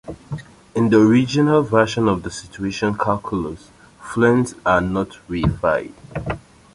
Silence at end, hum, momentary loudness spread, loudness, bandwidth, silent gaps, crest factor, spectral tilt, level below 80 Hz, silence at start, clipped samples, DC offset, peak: 0.35 s; none; 17 LU; -19 LUFS; 11.5 kHz; none; 18 dB; -6.5 dB/octave; -40 dBFS; 0.05 s; under 0.1%; under 0.1%; -2 dBFS